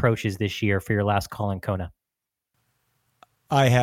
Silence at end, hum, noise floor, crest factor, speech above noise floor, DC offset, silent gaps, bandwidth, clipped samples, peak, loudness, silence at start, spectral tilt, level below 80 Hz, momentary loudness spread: 0 s; none; -86 dBFS; 20 dB; 63 dB; under 0.1%; none; 16 kHz; under 0.1%; -6 dBFS; -25 LUFS; 0 s; -6 dB/octave; -52 dBFS; 8 LU